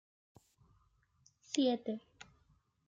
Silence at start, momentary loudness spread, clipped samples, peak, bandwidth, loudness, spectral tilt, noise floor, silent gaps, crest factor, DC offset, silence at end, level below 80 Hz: 1.5 s; 25 LU; under 0.1%; -20 dBFS; 9.4 kHz; -37 LUFS; -4 dB/octave; -73 dBFS; none; 22 dB; under 0.1%; 0.65 s; -78 dBFS